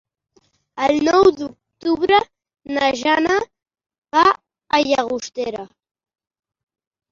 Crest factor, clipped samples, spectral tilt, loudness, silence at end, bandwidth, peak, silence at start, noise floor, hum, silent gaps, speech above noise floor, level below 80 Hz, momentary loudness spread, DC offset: 18 dB; under 0.1%; -3.5 dB/octave; -18 LUFS; 1.45 s; 7.6 kHz; -2 dBFS; 0.75 s; -61 dBFS; none; 3.98-4.02 s; 44 dB; -54 dBFS; 16 LU; under 0.1%